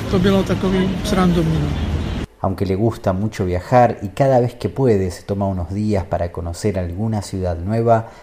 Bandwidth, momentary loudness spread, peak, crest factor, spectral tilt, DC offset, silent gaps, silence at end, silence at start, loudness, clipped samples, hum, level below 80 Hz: 15 kHz; 8 LU; -2 dBFS; 16 dB; -7 dB/octave; under 0.1%; none; 0 s; 0 s; -19 LUFS; under 0.1%; none; -32 dBFS